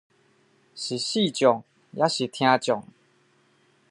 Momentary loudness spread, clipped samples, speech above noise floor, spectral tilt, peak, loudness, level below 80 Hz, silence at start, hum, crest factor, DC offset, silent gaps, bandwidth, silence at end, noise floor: 10 LU; under 0.1%; 40 dB; -4 dB/octave; -4 dBFS; -24 LUFS; -76 dBFS; 0.75 s; none; 22 dB; under 0.1%; none; 11.5 kHz; 1.1 s; -63 dBFS